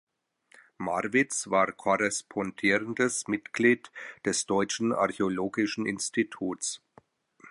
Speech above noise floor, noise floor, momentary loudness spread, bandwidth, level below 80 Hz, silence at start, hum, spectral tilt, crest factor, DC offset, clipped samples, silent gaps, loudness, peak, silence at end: 35 dB; -63 dBFS; 8 LU; 11.5 kHz; -68 dBFS; 0.8 s; none; -3.5 dB/octave; 20 dB; under 0.1%; under 0.1%; none; -28 LUFS; -10 dBFS; 0 s